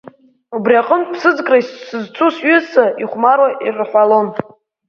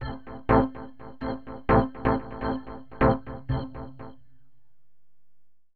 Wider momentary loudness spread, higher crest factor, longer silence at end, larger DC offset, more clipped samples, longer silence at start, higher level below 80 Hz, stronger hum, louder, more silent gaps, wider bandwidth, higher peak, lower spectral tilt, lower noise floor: second, 13 LU vs 19 LU; second, 14 dB vs 22 dB; first, 0.45 s vs 0 s; second, under 0.1% vs 0.6%; neither; first, 0.5 s vs 0 s; second, -64 dBFS vs -40 dBFS; second, none vs 50 Hz at -55 dBFS; first, -14 LUFS vs -27 LUFS; neither; first, 6.8 kHz vs 4.7 kHz; first, 0 dBFS vs -6 dBFS; second, -6 dB/octave vs -10.5 dB/octave; second, -38 dBFS vs -79 dBFS